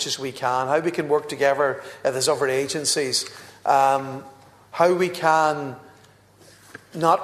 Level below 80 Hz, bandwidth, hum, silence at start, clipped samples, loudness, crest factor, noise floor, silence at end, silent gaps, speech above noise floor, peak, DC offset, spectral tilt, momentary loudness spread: -68 dBFS; 14 kHz; none; 0 s; under 0.1%; -22 LUFS; 20 dB; -53 dBFS; 0 s; none; 31 dB; -4 dBFS; under 0.1%; -3 dB/octave; 15 LU